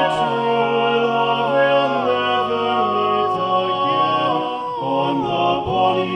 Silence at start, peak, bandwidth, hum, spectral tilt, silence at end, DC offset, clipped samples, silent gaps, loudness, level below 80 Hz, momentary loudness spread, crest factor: 0 s; -6 dBFS; 9.6 kHz; none; -6 dB/octave; 0 s; under 0.1%; under 0.1%; none; -18 LUFS; -54 dBFS; 3 LU; 12 dB